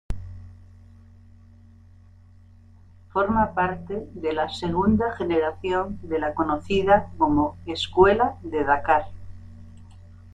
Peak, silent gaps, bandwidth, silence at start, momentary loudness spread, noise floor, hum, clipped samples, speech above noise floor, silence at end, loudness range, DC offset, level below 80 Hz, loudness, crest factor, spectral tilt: -4 dBFS; none; 9.4 kHz; 0.1 s; 14 LU; -50 dBFS; none; under 0.1%; 28 dB; 0.05 s; 7 LU; under 0.1%; -44 dBFS; -23 LUFS; 22 dB; -6.5 dB/octave